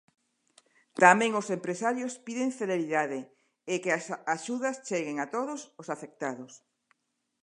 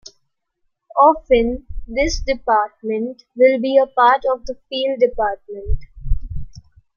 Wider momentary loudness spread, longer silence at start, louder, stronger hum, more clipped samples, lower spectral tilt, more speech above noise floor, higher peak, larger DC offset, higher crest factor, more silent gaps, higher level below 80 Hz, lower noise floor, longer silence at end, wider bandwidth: about the same, 17 LU vs 15 LU; about the same, 0.95 s vs 0.95 s; second, -29 LUFS vs -18 LUFS; neither; neither; about the same, -4 dB/octave vs -5 dB/octave; second, 44 dB vs 53 dB; about the same, -4 dBFS vs -2 dBFS; neither; first, 28 dB vs 16 dB; neither; second, -86 dBFS vs -30 dBFS; about the same, -73 dBFS vs -70 dBFS; first, 0.85 s vs 0.35 s; first, 11 kHz vs 7.2 kHz